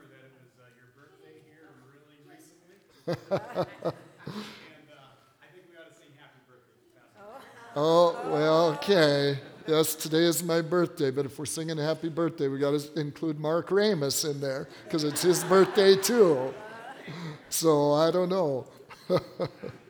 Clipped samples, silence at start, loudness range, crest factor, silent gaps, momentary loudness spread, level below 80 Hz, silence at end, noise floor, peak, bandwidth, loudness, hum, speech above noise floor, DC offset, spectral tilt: under 0.1%; 3.05 s; 14 LU; 22 dB; none; 19 LU; -74 dBFS; 0.15 s; -61 dBFS; -6 dBFS; over 20 kHz; -26 LUFS; none; 35 dB; under 0.1%; -4.5 dB/octave